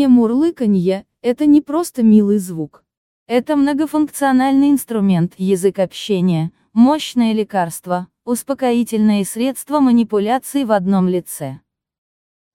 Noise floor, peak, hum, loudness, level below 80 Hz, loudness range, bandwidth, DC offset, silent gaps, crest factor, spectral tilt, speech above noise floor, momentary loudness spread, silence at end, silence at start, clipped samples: under -90 dBFS; -2 dBFS; none; -16 LUFS; -56 dBFS; 2 LU; 16.5 kHz; under 0.1%; 2.97-3.26 s; 14 dB; -6.5 dB/octave; over 75 dB; 9 LU; 1 s; 0 s; under 0.1%